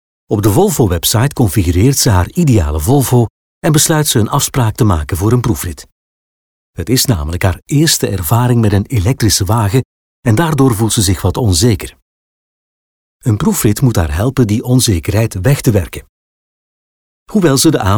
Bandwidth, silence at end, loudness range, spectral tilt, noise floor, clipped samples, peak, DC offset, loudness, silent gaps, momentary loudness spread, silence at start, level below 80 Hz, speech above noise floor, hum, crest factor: over 20 kHz; 0 s; 3 LU; -5 dB/octave; under -90 dBFS; under 0.1%; 0 dBFS; under 0.1%; -12 LUFS; 3.30-3.61 s, 5.92-6.73 s, 9.85-10.23 s, 12.02-13.20 s, 16.09-17.26 s; 7 LU; 0.3 s; -28 dBFS; over 79 dB; none; 12 dB